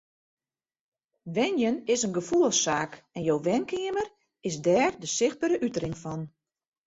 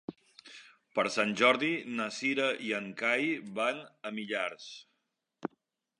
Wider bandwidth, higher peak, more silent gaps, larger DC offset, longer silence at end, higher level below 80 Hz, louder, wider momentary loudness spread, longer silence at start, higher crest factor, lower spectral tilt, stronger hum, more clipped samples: second, 8.2 kHz vs 11 kHz; about the same, -10 dBFS vs -10 dBFS; neither; neither; about the same, 0.6 s vs 0.55 s; first, -64 dBFS vs -82 dBFS; first, -27 LUFS vs -31 LUFS; second, 13 LU vs 22 LU; first, 1.25 s vs 0.1 s; second, 18 dB vs 24 dB; about the same, -4 dB/octave vs -3.5 dB/octave; neither; neither